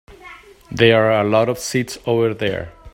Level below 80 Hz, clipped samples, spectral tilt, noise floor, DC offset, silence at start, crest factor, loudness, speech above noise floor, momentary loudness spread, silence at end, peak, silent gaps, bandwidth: -48 dBFS; under 0.1%; -5 dB/octave; -41 dBFS; under 0.1%; 0.1 s; 18 dB; -17 LUFS; 25 dB; 10 LU; 0.05 s; 0 dBFS; none; 16.5 kHz